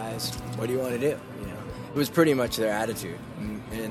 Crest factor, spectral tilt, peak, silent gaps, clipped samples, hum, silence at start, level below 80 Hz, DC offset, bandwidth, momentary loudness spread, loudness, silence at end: 20 dB; -5 dB/octave; -8 dBFS; none; under 0.1%; none; 0 s; -50 dBFS; under 0.1%; 14.5 kHz; 14 LU; -28 LUFS; 0 s